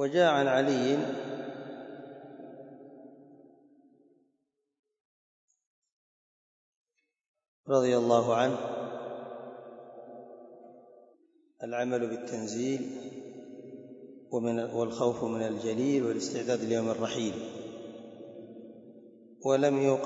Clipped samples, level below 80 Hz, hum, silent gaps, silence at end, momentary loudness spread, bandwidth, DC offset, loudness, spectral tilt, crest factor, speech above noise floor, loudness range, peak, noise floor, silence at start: under 0.1%; -78 dBFS; none; 4.79-4.83 s, 5.01-5.48 s, 5.66-5.82 s, 5.92-6.84 s, 7.28-7.34 s, 7.48-7.64 s; 0 s; 23 LU; 8 kHz; under 0.1%; -30 LUFS; -5.5 dB/octave; 22 dB; 52 dB; 12 LU; -10 dBFS; -80 dBFS; 0 s